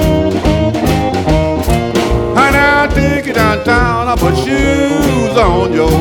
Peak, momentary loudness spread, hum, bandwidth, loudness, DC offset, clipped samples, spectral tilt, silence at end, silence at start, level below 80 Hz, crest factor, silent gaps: 0 dBFS; 4 LU; none; 18 kHz; -12 LUFS; under 0.1%; under 0.1%; -6 dB/octave; 0 s; 0 s; -20 dBFS; 10 dB; none